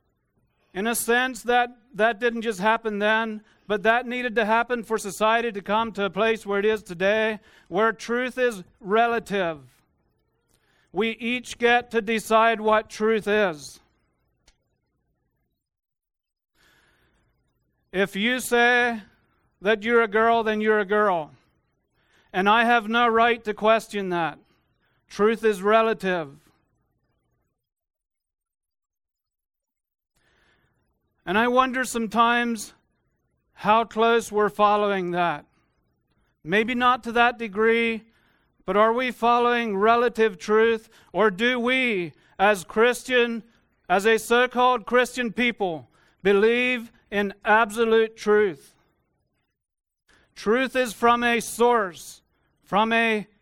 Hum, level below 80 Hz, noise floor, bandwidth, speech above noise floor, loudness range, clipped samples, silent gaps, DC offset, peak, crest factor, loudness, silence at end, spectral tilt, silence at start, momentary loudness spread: none; -60 dBFS; -75 dBFS; 16.5 kHz; 53 dB; 5 LU; under 0.1%; none; under 0.1%; -4 dBFS; 20 dB; -22 LUFS; 0.2 s; -4 dB/octave; 0.75 s; 10 LU